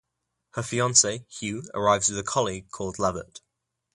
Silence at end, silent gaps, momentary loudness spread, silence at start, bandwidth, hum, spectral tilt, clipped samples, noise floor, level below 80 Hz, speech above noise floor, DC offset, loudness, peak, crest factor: 0.55 s; none; 15 LU; 0.55 s; 11.5 kHz; none; -2.5 dB/octave; under 0.1%; -81 dBFS; -56 dBFS; 55 dB; under 0.1%; -25 LUFS; -4 dBFS; 24 dB